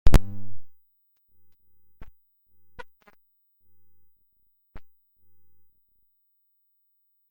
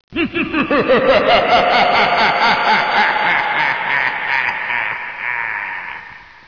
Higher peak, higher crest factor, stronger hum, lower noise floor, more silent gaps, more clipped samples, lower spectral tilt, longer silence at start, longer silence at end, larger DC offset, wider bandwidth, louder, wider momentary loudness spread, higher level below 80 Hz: first, -2 dBFS vs -6 dBFS; first, 22 dB vs 10 dB; first, 50 Hz at -80 dBFS vs none; first, -70 dBFS vs -36 dBFS; neither; neither; first, -6.5 dB/octave vs -4.5 dB/octave; about the same, 0.05 s vs 0.1 s; first, 2.5 s vs 0.25 s; second, under 0.1% vs 0.2%; first, 16.5 kHz vs 5.4 kHz; second, -30 LUFS vs -14 LUFS; first, 31 LU vs 9 LU; first, -34 dBFS vs -46 dBFS